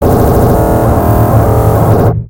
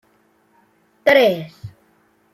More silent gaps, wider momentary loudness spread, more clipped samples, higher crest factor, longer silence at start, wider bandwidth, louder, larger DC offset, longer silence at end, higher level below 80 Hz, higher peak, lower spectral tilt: neither; second, 1 LU vs 26 LU; first, 0.9% vs under 0.1%; second, 8 dB vs 20 dB; second, 0 s vs 1.05 s; first, 17 kHz vs 15 kHz; first, -8 LUFS vs -16 LUFS; neither; second, 0 s vs 0.65 s; first, -18 dBFS vs -62 dBFS; about the same, 0 dBFS vs -2 dBFS; first, -8.5 dB/octave vs -5 dB/octave